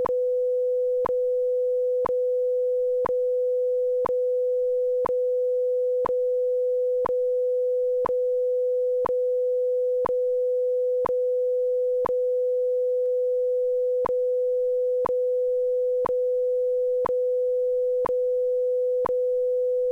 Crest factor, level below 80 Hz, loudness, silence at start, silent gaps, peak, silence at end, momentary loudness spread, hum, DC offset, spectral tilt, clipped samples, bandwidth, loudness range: 10 dB; -62 dBFS; -24 LUFS; 0 s; none; -14 dBFS; 0 s; 0 LU; none; under 0.1%; -7 dB/octave; under 0.1%; 2.8 kHz; 0 LU